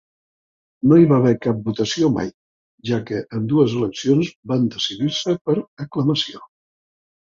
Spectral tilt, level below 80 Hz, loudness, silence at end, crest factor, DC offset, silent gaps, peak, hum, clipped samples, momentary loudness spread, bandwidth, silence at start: -6.5 dB/octave; -56 dBFS; -19 LUFS; 0.8 s; 18 dB; under 0.1%; 2.34-2.78 s, 4.36-4.43 s, 5.41-5.45 s, 5.68-5.77 s; -2 dBFS; none; under 0.1%; 10 LU; 7.6 kHz; 0.85 s